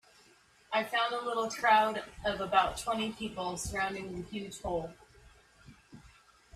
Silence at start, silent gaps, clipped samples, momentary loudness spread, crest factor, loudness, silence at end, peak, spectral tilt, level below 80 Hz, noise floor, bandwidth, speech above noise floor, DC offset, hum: 0.7 s; none; under 0.1%; 14 LU; 22 dB; -32 LUFS; 0.5 s; -12 dBFS; -3.5 dB/octave; -56 dBFS; -63 dBFS; 15 kHz; 31 dB; under 0.1%; none